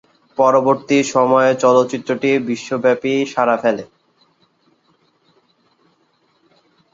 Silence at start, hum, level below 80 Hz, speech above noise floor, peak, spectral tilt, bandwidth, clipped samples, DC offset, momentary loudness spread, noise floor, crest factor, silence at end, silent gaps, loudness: 0.4 s; none; -66 dBFS; 46 dB; -2 dBFS; -5 dB/octave; 7.8 kHz; under 0.1%; under 0.1%; 7 LU; -61 dBFS; 16 dB; 3.1 s; none; -16 LUFS